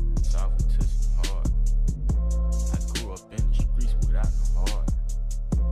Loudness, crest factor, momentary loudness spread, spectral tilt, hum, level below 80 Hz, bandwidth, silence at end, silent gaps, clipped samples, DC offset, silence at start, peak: -28 LUFS; 10 dB; 4 LU; -5.5 dB/octave; none; -22 dBFS; 11.5 kHz; 0 s; none; under 0.1%; under 0.1%; 0 s; -12 dBFS